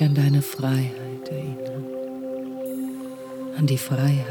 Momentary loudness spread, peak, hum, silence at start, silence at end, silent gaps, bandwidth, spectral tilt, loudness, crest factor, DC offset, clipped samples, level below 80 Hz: 12 LU; -8 dBFS; none; 0 s; 0 s; none; 19 kHz; -7 dB/octave; -26 LUFS; 16 dB; under 0.1%; under 0.1%; -68 dBFS